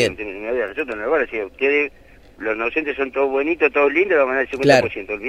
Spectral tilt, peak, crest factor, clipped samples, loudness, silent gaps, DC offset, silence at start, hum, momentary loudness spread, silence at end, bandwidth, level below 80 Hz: -5 dB/octave; -2 dBFS; 18 dB; under 0.1%; -19 LUFS; none; under 0.1%; 0 s; none; 10 LU; 0 s; 13 kHz; -50 dBFS